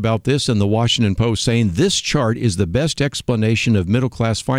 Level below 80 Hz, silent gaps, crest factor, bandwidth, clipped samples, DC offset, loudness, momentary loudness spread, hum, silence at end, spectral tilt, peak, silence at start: -40 dBFS; none; 14 dB; 14 kHz; under 0.1%; under 0.1%; -17 LUFS; 3 LU; none; 0 s; -5 dB/octave; -2 dBFS; 0 s